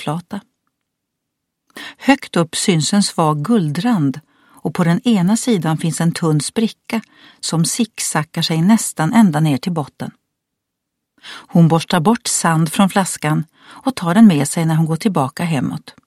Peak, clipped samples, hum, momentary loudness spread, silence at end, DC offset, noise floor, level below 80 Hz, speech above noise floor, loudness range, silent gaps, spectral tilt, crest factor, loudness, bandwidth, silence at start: 0 dBFS; under 0.1%; none; 12 LU; 0.15 s; under 0.1%; -77 dBFS; -58 dBFS; 62 dB; 3 LU; none; -5 dB/octave; 16 dB; -16 LUFS; 14.5 kHz; 0 s